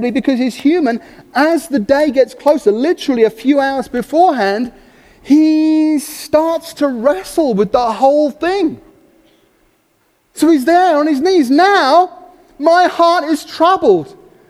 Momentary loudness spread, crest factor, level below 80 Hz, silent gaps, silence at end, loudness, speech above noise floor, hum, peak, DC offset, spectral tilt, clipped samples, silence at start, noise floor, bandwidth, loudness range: 8 LU; 14 dB; -50 dBFS; none; 0.4 s; -13 LUFS; 46 dB; none; 0 dBFS; under 0.1%; -5 dB/octave; under 0.1%; 0 s; -58 dBFS; 15 kHz; 4 LU